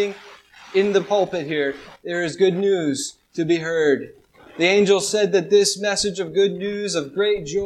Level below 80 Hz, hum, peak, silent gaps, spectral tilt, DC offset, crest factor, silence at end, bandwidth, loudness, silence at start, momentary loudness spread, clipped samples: -58 dBFS; none; -4 dBFS; none; -4 dB/octave; under 0.1%; 18 dB; 0 s; 13.5 kHz; -20 LUFS; 0 s; 10 LU; under 0.1%